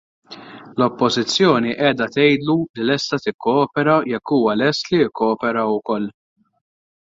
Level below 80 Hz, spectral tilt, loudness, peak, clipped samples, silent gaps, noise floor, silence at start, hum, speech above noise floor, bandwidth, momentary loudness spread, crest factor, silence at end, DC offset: -58 dBFS; -5 dB/octave; -18 LUFS; -2 dBFS; under 0.1%; 2.70-2.74 s, 3.34-3.39 s; -39 dBFS; 0.3 s; none; 21 dB; 7.8 kHz; 8 LU; 16 dB; 0.9 s; under 0.1%